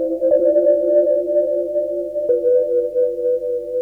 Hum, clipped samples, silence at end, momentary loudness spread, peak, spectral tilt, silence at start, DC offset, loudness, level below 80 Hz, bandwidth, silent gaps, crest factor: 50 Hz at -55 dBFS; under 0.1%; 0 s; 7 LU; -4 dBFS; -8.5 dB/octave; 0 s; under 0.1%; -17 LUFS; -56 dBFS; 1.9 kHz; none; 12 dB